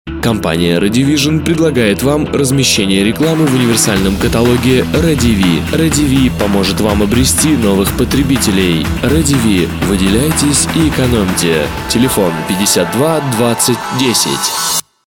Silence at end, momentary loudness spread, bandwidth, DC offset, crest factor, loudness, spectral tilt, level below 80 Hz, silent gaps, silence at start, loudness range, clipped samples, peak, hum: 0.25 s; 3 LU; 18.5 kHz; 0.1%; 12 dB; -11 LUFS; -4.5 dB/octave; -26 dBFS; none; 0.05 s; 1 LU; under 0.1%; 0 dBFS; none